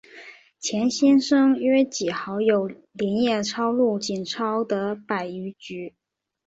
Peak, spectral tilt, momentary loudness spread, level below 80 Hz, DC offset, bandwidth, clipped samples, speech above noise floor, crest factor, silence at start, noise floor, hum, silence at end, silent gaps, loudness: -8 dBFS; -4.5 dB/octave; 16 LU; -68 dBFS; under 0.1%; 8 kHz; under 0.1%; 24 dB; 14 dB; 0.15 s; -46 dBFS; none; 0.55 s; none; -23 LUFS